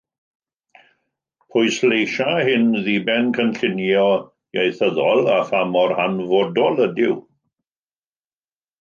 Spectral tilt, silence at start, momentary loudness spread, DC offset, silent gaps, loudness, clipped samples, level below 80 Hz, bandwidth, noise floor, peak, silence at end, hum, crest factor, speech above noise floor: -5.5 dB/octave; 1.55 s; 5 LU; under 0.1%; none; -19 LUFS; under 0.1%; -68 dBFS; 7.4 kHz; under -90 dBFS; -4 dBFS; 1.6 s; none; 16 dB; over 72 dB